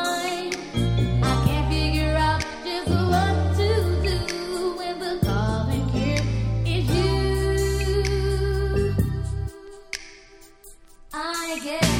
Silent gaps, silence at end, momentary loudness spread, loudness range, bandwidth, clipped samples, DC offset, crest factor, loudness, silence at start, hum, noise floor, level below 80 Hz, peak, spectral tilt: none; 0 s; 8 LU; 5 LU; 16.5 kHz; under 0.1%; under 0.1%; 18 dB; -24 LUFS; 0 s; none; -48 dBFS; -30 dBFS; -6 dBFS; -5.5 dB/octave